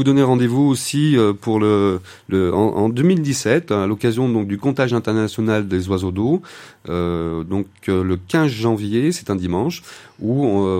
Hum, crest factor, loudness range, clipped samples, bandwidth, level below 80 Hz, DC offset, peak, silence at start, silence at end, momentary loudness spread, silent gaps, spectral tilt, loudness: none; 16 dB; 4 LU; under 0.1%; 16.5 kHz; -48 dBFS; under 0.1%; -2 dBFS; 0 s; 0 s; 8 LU; none; -6.5 dB/octave; -19 LUFS